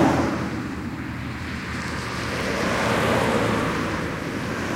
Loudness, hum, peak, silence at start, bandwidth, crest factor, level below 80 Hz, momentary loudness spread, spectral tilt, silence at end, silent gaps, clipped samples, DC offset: -25 LUFS; none; -6 dBFS; 0 s; 16 kHz; 18 dB; -42 dBFS; 10 LU; -5.5 dB/octave; 0 s; none; under 0.1%; under 0.1%